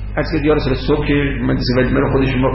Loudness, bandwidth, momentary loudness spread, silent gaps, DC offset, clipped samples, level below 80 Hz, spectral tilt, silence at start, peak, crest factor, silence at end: -16 LUFS; 5.8 kHz; 3 LU; none; under 0.1%; under 0.1%; -24 dBFS; -10 dB/octave; 0 s; -4 dBFS; 10 dB; 0 s